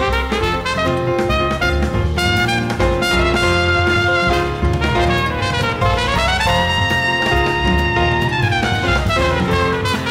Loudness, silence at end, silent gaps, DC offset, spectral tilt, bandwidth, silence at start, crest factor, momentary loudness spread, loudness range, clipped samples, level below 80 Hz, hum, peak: -16 LUFS; 0 s; none; under 0.1%; -5 dB/octave; 16 kHz; 0 s; 12 dB; 3 LU; 1 LU; under 0.1%; -26 dBFS; none; -4 dBFS